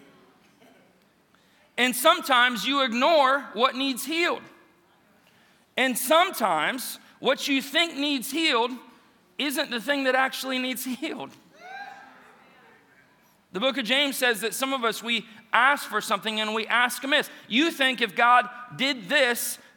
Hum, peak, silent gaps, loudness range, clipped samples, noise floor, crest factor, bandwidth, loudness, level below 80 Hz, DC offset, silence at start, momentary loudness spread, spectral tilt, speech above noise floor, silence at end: none; -4 dBFS; none; 6 LU; under 0.1%; -62 dBFS; 22 dB; 19.5 kHz; -24 LUFS; -84 dBFS; under 0.1%; 1.75 s; 13 LU; -2 dB/octave; 37 dB; 0.2 s